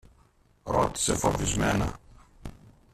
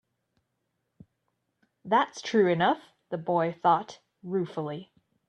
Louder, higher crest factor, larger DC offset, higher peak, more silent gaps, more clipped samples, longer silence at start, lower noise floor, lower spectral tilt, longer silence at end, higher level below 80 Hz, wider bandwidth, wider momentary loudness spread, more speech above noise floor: about the same, -27 LUFS vs -27 LUFS; about the same, 20 dB vs 20 dB; neither; about the same, -10 dBFS vs -10 dBFS; neither; neither; second, 0.65 s vs 1.85 s; second, -62 dBFS vs -80 dBFS; second, -4 dB/octave vs -6 dB/octave; about the same, 0.4 s vs 0.45 s; first, -42 dBFS vs -74 dBFS; first, 14.5 kHz vs 9.2 kHz; first, 22 LU vs 14 LU; second, 35 dB vs 53 dB